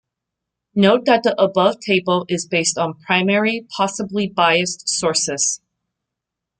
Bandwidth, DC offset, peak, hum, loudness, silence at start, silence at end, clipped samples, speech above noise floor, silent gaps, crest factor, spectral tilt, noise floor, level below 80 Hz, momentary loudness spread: 9.6 kHz; under 0.1%; -2 dBFS; none; -18 LUFS; 0.75 s; 1.05 s; under 0.1%; 65 dB; none; 16 dB; -3.5 dB/octave; -83 dBFS; -60 dBFS; 7 LU